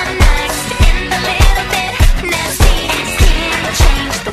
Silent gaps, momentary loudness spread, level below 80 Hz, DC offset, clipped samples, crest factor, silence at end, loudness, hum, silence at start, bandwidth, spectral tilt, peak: none; 3 LU; -12 dBFS; under 0.1%; 0.1%; 12 dB; 0 s; -13 LUFS; none; 0 s; 14.5 kHz; -3.5 dB/octave; 0 dBFS